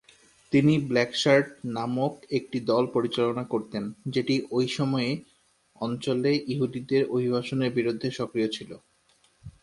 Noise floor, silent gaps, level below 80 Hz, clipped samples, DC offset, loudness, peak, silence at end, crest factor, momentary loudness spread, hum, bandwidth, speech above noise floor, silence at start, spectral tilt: -65 dBFS; none; -64 dBFS; under 0.1%; under 0.1%; -27 LUFS; -8 dBFS; 0.15 s; 20 dB; 10 LU; none; 11.5 kHz; 39 dB; 0.5 s; -6 dB/octave